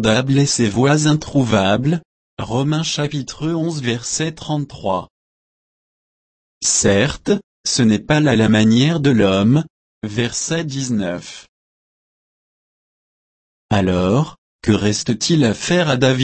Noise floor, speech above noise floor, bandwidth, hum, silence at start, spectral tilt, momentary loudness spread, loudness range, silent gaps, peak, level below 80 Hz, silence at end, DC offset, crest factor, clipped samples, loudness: under -90 dBFS; over 74 dB; 8.8 kHz; none; 0 s; -5 dB/octave; 10 LU; 9 LU; 2.05-2.37 s, 5.10-6.61 s, 7.43-7.64 s, 9.70-10.01 s, 11.48-13.69 s, 14.38-14.59 s; -2 dBFS; -46 dBFS; 0 s; under 0.1%; 16 dB; under 0.1%; -17 LUFS